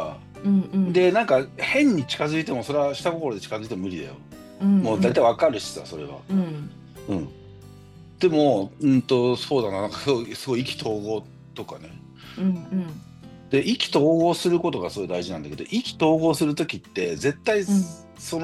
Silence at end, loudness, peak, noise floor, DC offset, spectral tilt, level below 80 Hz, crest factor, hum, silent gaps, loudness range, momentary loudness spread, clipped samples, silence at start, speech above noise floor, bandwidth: 0 s; -23 LUFS; -6 dBFS; -46 dBFS; under 0.1%; -6 dB/octave; -58 dBFS; 16 dB; none; none; 5 LU; 17 LU; under 0.1%; 0 s; 23 dB; 12.5 kHz